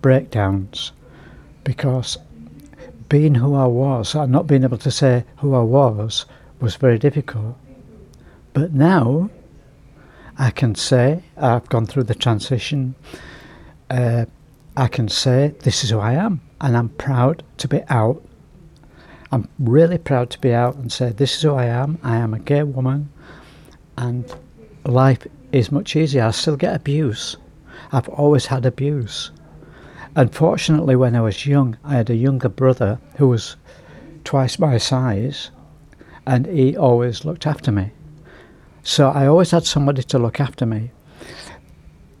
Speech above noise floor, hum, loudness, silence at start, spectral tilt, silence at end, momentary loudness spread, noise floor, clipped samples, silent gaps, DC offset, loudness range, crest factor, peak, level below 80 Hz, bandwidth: 29 dB; none; -18 LUFS; 0.05 s; -6.5 dB/octave; 0.65 s; 13 LU; -46 dBFS; under 0.1%; none; under 0.1%; 4 LU; 16 dB; -2 dBFS; -48 dBFS; 12 kHz